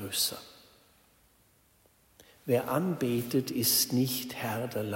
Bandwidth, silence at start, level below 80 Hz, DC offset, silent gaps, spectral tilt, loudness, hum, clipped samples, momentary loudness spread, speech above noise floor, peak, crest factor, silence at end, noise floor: 16.5 kHz; 0 s; -70 dBFS; under 0.1%; none; -4 dB/octave; -29 LUFS; none; under 0.1%; 9 LU; 35 dB; -12 dBFS; 20 dB; 0 s; -66 dBFS